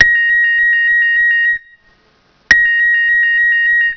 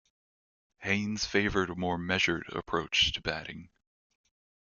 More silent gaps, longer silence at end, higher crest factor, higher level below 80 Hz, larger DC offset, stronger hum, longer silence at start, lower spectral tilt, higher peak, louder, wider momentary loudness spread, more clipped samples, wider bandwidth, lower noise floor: neither; second, 0 s vs 1.1 s; second, 12 dB vs 22 dB; first, -48 dBFS vs -54 dBFS; neither; neither; second, 0 s vs 0.8 s; second, -0.5 dB/octave vs -3.5 dB/octave; first, 0 dBFS vs -12 dBFS; first, -10 LUFS vs -30 LUFS; second, 3 LU vs 12 LU; first, 0.4% vs under 0.1%; second, 5.4 kHz vs 7.4 kHz; second, -53 dBFS vs under -90 dBFS